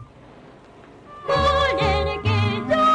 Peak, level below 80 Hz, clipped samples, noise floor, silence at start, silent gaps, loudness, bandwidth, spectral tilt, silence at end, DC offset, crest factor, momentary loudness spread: -12 dBFS; -36 dBFS; under 0.1%; -46 dBFS; 0 s; none; -20 LUFS; 10.5 kHz; -6 dB/octave; 0 s; under 0.1%; 10 dB; 4 LU